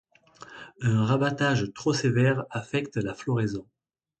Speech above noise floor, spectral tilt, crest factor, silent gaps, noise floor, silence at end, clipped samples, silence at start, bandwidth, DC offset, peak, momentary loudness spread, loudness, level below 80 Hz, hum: 25 dB; -6 dB/octave; 16 dB; none; -50 dBFS; 0.6 s; under 0.1%; 0.4 s; 8.8 kHz; under 0.1%; -10 dBFS; 13 LU; -26 LUFS; -58 dBFS; none